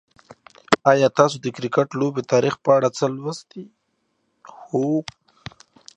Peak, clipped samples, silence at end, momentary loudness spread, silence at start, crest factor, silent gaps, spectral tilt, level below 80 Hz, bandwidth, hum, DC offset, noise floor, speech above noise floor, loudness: 0 dBFS; under 0.1%; 0.95 s; 24 LU; 0.7 s; 22 dB; none; -5.5 dB/octave; -62 dBFS; 10 kHz; none; under 0.1%; -71 dBFS; 51 dB; -20 LUFS